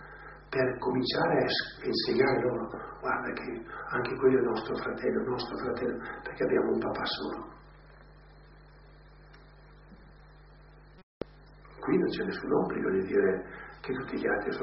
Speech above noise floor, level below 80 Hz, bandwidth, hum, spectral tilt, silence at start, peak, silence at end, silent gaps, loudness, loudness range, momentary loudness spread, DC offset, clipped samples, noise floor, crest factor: 24 dB; -56 dBFS; 5.8 kHz; none; -3.5 dB/octave; 0 s; -12 dBFS; 0 s; 11.03-11.21 s; -30 LUFS; 11 LU; 13 LU; under 0.1%; under 0.1%; -54 dBFS; 20 dB